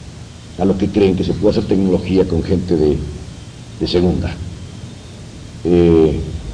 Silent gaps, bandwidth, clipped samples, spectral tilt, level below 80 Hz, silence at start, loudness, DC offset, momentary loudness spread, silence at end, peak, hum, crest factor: none; 10.5 kHz; under 0.1%; -7.5 dB/octave; -32 dBFS; 0 s; -16 LUFS; under 0.1%; 21 LU; 0 s; -2 dBFS; none; 16 dB